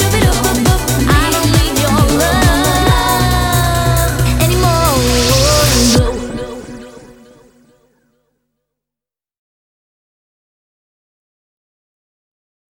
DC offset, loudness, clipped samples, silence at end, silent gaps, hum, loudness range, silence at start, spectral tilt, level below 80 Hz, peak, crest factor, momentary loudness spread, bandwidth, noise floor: under 0.1%; -12 LUFS; under 0.1%; 5.75 s; none; 50 Hz at -40 dBFS; 7 LU; 0 s; -4.5 dB/octave; -22 dBFS; 0 dBFS; 14 dB; 10 LU; over 20 kHz; -88 dBFS